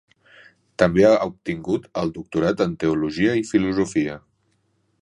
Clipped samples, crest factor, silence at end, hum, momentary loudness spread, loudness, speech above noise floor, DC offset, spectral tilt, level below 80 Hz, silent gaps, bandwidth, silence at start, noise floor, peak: under 0.1%; 22 dB; 0.85 s; none; 11 LU; -21 LUFS; 47 dB; under 0.1%; -6.5 dB/octave; -50 dBFS; none; 11 kHz; 0.8 s; -67 dBFS; 0 dBFS